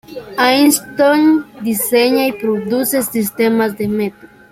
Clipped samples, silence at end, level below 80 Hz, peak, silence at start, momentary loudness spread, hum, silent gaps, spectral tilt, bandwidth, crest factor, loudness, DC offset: under 0.1%; 0.25 s; -54 dBFS; 0 dBFS; 0.1 s; 8 LU; none; none; -3.5 dB/octave; 16.5 kHz; 14 dB; -14 LUFS; under 0.1%